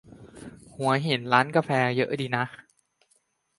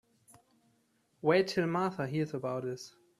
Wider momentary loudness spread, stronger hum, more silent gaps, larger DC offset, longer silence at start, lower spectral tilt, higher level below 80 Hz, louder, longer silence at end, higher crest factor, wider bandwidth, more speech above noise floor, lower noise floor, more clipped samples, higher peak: first, 23 LU vs 10 LU; neither; neither; neither; second, 0.1 s vs 1.25 s; about the same, -6 dB/octave vs -6 dB/octave; first, -64 dBFS vs -72 dBFS; first, -25 LUFS vs -32 LUFS; first, 1.05 s vs 0.3 s; about the same, 24 dB vs 20 dB; second, 11.5 kHz vs 13.5 kHz; first, 45 dB vs 41 dB; second, -69 dBFS vs -73 dBFS; neither; first, -4 dBFS vs -14 dBFS